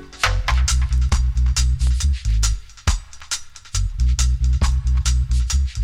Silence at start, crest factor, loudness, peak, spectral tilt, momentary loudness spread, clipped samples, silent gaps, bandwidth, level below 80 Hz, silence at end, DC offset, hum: 0 s; 14 dB; -21 LUFS; -4 dBFS; -3 dB/octave; 7 LU; under 0.1%; none; 12 kHz; -20 dBFS; 0 s; under 0.1%; none